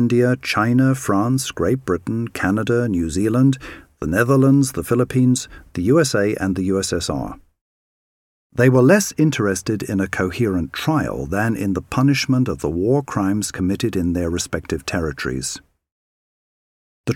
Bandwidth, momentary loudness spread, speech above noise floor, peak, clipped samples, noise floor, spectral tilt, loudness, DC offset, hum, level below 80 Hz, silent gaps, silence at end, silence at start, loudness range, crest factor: 16.5 kHz; 9 LU; over 72 dB; -2 dBFS; under 0.1%; under -90 dBFS; -6 dB/octave; -19 LUFS; under 0.1%; none; -42 dBFS; 7.61-8.50 s, 15.92-17.04 s; 0 s; 0 s; 4 LU; 18 dB